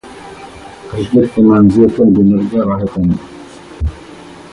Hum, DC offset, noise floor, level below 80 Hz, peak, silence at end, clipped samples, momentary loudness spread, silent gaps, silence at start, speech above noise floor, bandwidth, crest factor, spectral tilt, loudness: none; under 0.1%; -34 dBFS; -30 dBFS; 0 dBFS; 0.05 s; under 0.1%; 24 LU; none; 0.05 s; 24 dB; 11 kHz; 12 dB; -9 dB/octave; -12 LUFS